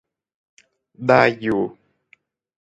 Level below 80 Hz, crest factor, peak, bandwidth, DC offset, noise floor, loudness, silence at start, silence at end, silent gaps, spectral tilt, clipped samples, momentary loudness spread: -60 dBFS; 22 dB; 0 dBFS; 9 kHz; under 0.1%; -59 dBFS; -19 LUFS; 1 s; 0.9 s; none; -7 dB/octave; under 0.1%; 11 LU